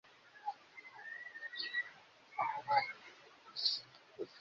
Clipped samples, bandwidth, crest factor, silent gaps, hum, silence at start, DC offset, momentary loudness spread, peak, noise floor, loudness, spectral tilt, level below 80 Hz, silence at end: under 0.1%; 7.4 kHz; 24 dB; none; none; 0.05 s; under 0.1%; 22 LU; -20 dBFS; -60 dBFS; -40 LUFS; 2 dB/octave; -88 dBFS; 0 s